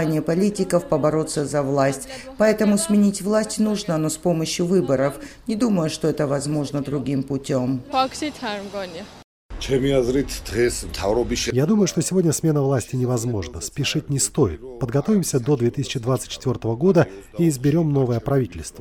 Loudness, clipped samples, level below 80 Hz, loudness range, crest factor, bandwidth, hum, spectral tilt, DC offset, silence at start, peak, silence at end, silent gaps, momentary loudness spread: -21 LUFS; under 0.1%; -42 dBFS; 4 LU; 16 dB; 19 kHz; none; -5.5 dB/octave; under 0.1%; 0 s; -4 dBFS; 0 s; 9.24-9.49 s; 8 LU